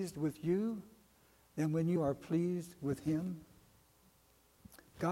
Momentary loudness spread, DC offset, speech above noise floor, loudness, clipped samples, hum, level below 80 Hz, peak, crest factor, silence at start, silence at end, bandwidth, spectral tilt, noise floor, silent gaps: 13 LU; under 0.1%; 33 dB; -37 LUFS; under 0.1%; none; -68 dBFS; -22 dBFS; 16 dB; 0 s; 0 s; 16.5 kHz; -8 dB/octave; -69 dBFS; none